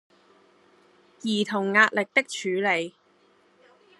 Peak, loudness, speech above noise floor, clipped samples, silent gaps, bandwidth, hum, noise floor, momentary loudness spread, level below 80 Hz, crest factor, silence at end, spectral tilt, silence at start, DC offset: -4 dBFS; -24 LUFS; 38 dB; under 0.1%; none; 12 kHz; none; -62 dBFS; 10 LU; -82 dBFS; 24 dB; 1.1 s; -4 dB/octave; 1.25 s; under 0.1%